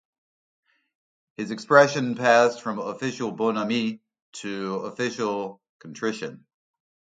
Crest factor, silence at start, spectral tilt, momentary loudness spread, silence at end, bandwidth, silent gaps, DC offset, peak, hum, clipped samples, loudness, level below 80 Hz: 24 dB; 1.4 s; -4.5 dB/octave; 19 LU; 0.8 s; 9.2 kHz; 4.22-4.32 s, 5.69-5.80 s; under 0.1%; -2 dBFS; none; under 0.1%; -24 LUFS; -74 dBFS